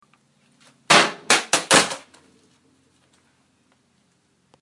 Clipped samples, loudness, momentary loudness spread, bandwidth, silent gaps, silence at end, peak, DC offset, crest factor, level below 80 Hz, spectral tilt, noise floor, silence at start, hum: under 0.1%; -17 LUFS; 9 LU; 11.5 kHz; none; 2.65 s; 0 dBFS; under 0.1%; 24 dB; -66 dBFS; -1 dB/octave; -65 dBFS; 0.9 s; none